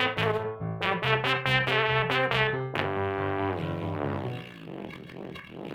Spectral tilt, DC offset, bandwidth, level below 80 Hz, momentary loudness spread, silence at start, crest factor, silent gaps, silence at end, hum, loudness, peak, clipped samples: -6 dB/octave; under 0.1%; 15.5 kHz; -56 dBFS; 17 LU; 0 s; 22 dB; none; 0 s; none; -27 LUFS; -6 dBFS; under 0.1%